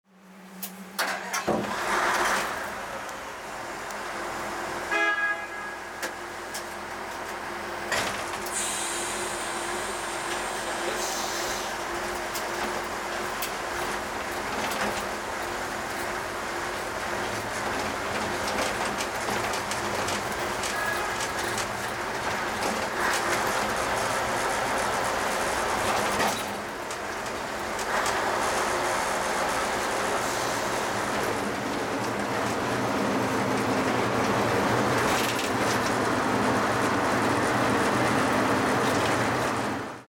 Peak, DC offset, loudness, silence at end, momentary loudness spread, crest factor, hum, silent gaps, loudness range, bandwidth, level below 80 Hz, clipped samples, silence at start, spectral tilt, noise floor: -12 dBFS; under 0.1%; -27 LUFS; 0.1 s; 9 LU; 16 dB; none; none; 5 LU; over 20 kHz; -52 dBFS; under 0.1%; 0.25 s; -3 dB/octave; -49 dBFS